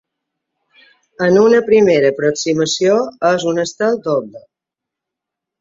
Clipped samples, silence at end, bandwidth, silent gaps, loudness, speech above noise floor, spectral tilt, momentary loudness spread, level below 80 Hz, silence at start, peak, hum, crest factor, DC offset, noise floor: under 0.1%; 1.2 s; 7.8 kHz; none; -14 LUFS; 70 dB; -4.5 dB/octave; 8 LU; -58 dBFS; 1.2 s; -2 dBFS; none; 14 dB; under 0.1%; -83 dBFS